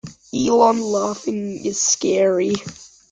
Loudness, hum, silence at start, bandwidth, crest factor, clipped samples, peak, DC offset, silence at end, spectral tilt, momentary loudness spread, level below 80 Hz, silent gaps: -19 LUFS; none; 0.05 s; 10 kHz; 18 dB; under 0.1%; -2 dBFS; under 0.1%; 0.25 s; -3.5 dB/octave; 11 LU; -56 dBFS; none